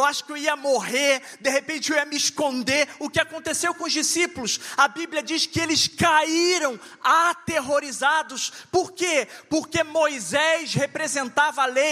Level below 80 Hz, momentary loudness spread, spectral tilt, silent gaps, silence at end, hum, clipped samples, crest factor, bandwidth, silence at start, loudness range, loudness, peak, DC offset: -62 dBFS; 6 LU; -2 dB/octave; none; 0 s; none; under 0.1%; 20 dB; 15.5 kHz; 0 s; 2 LU; -22 LUFS; -4 dBFS; under 0.1%